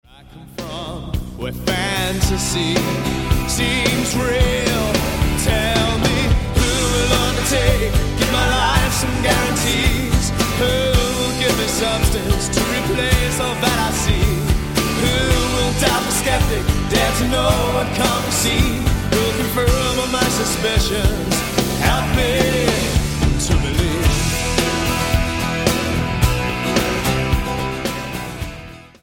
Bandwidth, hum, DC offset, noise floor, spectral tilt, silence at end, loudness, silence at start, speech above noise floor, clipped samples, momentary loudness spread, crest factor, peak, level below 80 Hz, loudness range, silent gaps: 17.5 kHz; none; under 0.1%; -40 dBFS; -4 dB/octave; 0.2 s; -18 LUFS; 0.3 s; 23 dB; under 0.1%; 4 LU; 16 dB; -2 dBFS; -24 dBFS; 2 LU; none